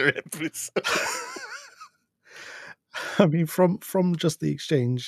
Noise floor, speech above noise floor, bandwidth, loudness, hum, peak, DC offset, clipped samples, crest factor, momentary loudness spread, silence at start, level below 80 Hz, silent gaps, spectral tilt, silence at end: -56 dBFS; 32 dB; 14 kHz; -25 LUFS; none; -4 dBFS; under 0.1%; under 0.1%; 22 dB; 19 LU; 0 s; -70 dBFS; none; -5 dB/octave; 0 s